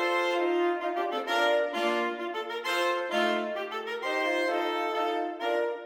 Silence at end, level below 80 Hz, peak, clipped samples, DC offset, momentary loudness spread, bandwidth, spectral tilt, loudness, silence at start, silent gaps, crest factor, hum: 0 s; -82 dBFS; -14 dBFS; under 0.1%; under 0.1%; 6 LU; 17 kHz; -2.5 dB/octave; -29 LUFS; 0 s; none; 14 dB; none